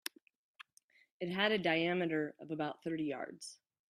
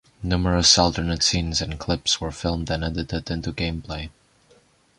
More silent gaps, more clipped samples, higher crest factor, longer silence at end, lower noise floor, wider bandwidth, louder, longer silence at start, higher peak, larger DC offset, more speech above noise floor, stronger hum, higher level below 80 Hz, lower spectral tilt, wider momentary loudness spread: first, 0.84-0.89 s, 1.11-1.20 s vs none; neither; about the same, 22 dB vs 24 dB; second, 0.35 s vs 0.9 s; first, -70 dBFS vs -58 dBFS; first, 15 kHz vs 11 kHz; second, -36 LUFS vs -22 LUFS; first, 0.6 s vs 0.2 s; second, -16 dBFS vs 0 dBFS; neither; about the same, 34 dB vs 35 dB; neither; second, -80 dBFS vs -36 dBFS; first, -5 dB/octave vs -3.5 dB/octave; about the same, 14 LU vs 14 LU